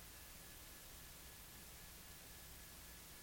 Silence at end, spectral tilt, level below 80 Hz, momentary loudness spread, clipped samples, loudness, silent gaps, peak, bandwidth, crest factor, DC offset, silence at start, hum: 0 s; -2 dB/octave; -64 dBFS; 0 LU; under 0.1%; -56 LUFS; none; -44 dBFS; 17 kHz; 14 dB; under 0.1%; 0 s; none